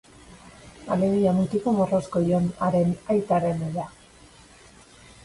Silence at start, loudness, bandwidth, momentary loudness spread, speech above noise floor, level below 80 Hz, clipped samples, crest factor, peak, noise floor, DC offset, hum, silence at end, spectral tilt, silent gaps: 0.3 s; -24 LUFS; 11.5 kHz; 9 LU; 28 dB; -54 dBFS; under 0.1%; 16 dB; -10 dBFS; -51 dBFS; under 0.1%; none; 1.35 s; -8.5 dB/octave; none